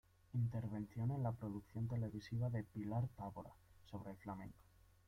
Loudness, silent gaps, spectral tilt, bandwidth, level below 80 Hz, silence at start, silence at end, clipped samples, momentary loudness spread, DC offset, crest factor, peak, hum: -45 LUFS; none; -9 dB/octave; 6.2 kHz; -68 dBFS; 0.35 s; 0.45 s; under 0.1%; 11 LU; under 0.1%; 16 dB; -30 dBFS; none